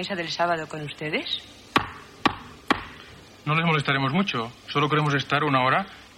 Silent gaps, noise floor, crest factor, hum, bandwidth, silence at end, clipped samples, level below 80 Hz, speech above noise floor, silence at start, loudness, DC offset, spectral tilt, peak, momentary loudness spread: none; -46 dBFS; 20 dB; none; 15 kHz; 0.1 s; under 0.1%; -56 dBFS; 22 dB; 0 s; -25 LUFS; under 0.1%; -5.5 dB/octave; -6 dBFS; 11 LU